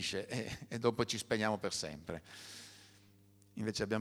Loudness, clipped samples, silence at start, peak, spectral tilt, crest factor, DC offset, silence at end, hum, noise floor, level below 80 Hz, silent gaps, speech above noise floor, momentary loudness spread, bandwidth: -38 LUFS; under 0.1%; 0 s; -18 dBFS; -4 dB/octave; 22 dB; under 0.1%; 0 s; 50 Hz at -65 dBFS; -65 dBFS; -66 dBFS; none; 27 dB; 16 LU; over 20 kHz